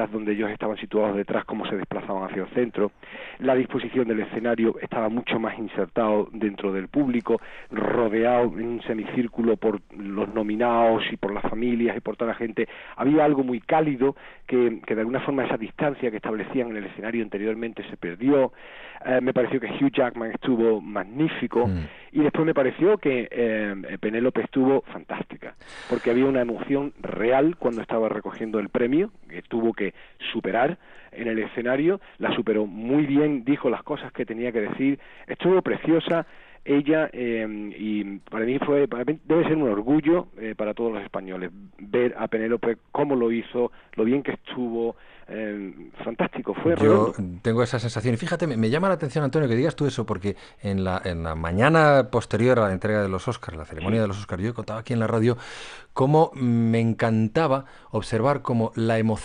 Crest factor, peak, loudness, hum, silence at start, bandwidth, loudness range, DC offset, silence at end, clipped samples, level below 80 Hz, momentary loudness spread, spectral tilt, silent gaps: 20 dB; -4 dBFS; -24 LUFS; none; 0 s; 10 kHz; 4 LU; under 0.1%; 0 s; under 0.1%; -52 dBFS; 11 LU; -7.5 dB/octave; none